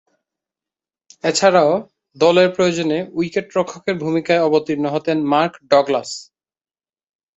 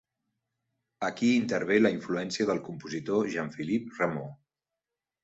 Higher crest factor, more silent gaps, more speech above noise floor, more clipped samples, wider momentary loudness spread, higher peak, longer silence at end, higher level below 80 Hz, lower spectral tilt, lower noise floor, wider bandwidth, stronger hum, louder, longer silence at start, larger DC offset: about the same, 18 dB vs 20 dB; neither; first, over 73 dB vs 60 dB; neither; about the same, 9 LU vs 11 LU; first, -2 dBFS vs -10 dBFS; first, 1.15 s vs 0.9 s; first, -62 dBFS vs -70 dBFS; about the same, -4.5 dB/octave vs -5.5 dB/octave; about the same, under -90 dBFS vs -89 dBFS; about the same, 8.4 kHz vs 8 kHz; neither; first, -17 LUFS vs -29 LUFS; first, 1.25 s vs 1 s; neither